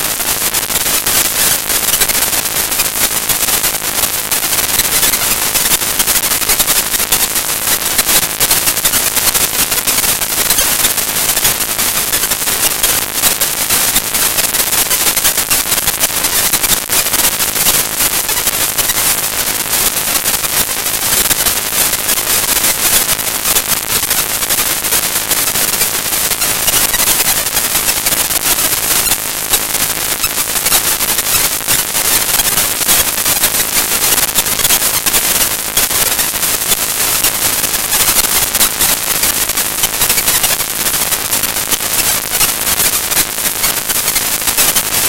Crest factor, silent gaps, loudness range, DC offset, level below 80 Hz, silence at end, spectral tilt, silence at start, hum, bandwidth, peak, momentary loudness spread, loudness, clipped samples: 14 dB; none; 1 LU; 0.6%; -36 dBFS; 0 s; 0 dB/octave; 0 s; none; over 20 kHz; 0 dBFS; 3 LU; -10 LUFS; under 0.1%